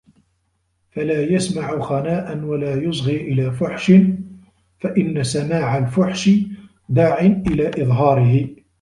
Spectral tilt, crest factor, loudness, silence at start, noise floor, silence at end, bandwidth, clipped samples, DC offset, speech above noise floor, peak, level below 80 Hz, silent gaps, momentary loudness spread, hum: -7 dB/octave; 16 dB; -18 LUFS; 0.95 s; -67 dBFS; 0.25 s; 11.5 kHz; under 0.1%; under 0.1%; 50 dB; -2 dBFS; -46 dBFS; none; 11 LU; none